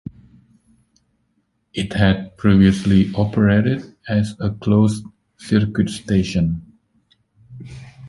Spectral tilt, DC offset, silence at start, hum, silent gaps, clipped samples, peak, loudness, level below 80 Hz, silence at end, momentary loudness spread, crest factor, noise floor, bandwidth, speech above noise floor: -7 dB/octave; under 0.1%; 1.75 s; none; none; under 0.1%; -2 dBFS; -18 LUFS; -38 dBFS; 0 s; 20 LU; 18 dB; -67 dBFS; 11.5 kHz; 50 dB